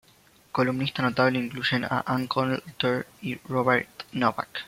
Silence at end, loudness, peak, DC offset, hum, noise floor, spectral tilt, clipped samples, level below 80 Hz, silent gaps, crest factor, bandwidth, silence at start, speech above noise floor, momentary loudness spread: 0 s; -26 LUFS; -6 dBFS; under 0.1%; none; -58 dBFS; -6 dB/octave; under 0.1%; -64 dBFS; none; 20 dB; 16.5 kHz; 0.55 s; 32 dB; 7 LU